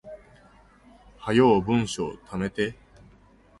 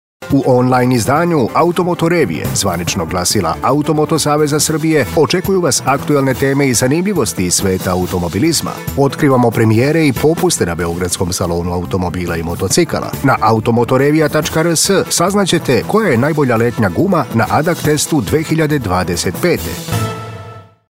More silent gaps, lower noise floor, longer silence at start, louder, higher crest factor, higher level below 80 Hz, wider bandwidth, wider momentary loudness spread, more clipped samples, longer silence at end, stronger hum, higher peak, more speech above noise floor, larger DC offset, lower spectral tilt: neither; first, -56 dBFS vs -34 dBFS; second, 0.05 s vs 0.2 s; second, -24 LUFS vs -13 LUFS; first, 20 dB vs 12 dB; second, -52 dBFS vs -38 dBFS; second, 11.5 kHz vs 16.5 kHz; first, 19 LU vs 6 LU; neither; first, 0.85 s vs 0.3 s; neither; second, -6 dBFS vs -2 dBFS; first, 32 dB vs 20 dB; second, under 0.1% vs 0.1%; about the same, -6 dB/octave vs -5 dB/octave